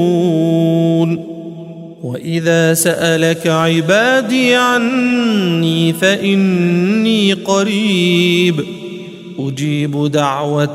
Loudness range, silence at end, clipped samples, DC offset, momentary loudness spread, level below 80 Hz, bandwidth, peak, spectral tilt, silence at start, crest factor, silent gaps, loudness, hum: 2 LU; 0 s; under 0.1%; under 0.1%; 14 LU; -60 dBFS; 16 kHz; 0 dBFS; -5 dB/octave; 0 s; 14 dB; none; -13 LUFS; none